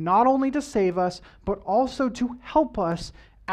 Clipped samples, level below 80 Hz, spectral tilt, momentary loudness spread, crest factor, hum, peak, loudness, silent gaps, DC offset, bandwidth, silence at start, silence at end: under 0.1%; -48 dBFS; -6.5 dB/octave; 13 LU; 16 dB; none; -8 dBFS; -24 LUFS; none; under 0.1%; 10.5 kHz; 0 s; 0 s